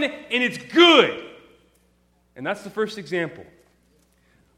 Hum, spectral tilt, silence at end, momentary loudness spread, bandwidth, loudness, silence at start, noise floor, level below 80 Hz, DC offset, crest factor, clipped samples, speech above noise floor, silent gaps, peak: none; -4 dB/octave; 1.15 s; 18 LU; 12.5 kHz; -20 LUFS; 0 s; -63 dBFS; -66 dBFS; under 0.1%; 22 dB; under 0.1%; 42 dB; none; -2 dBFS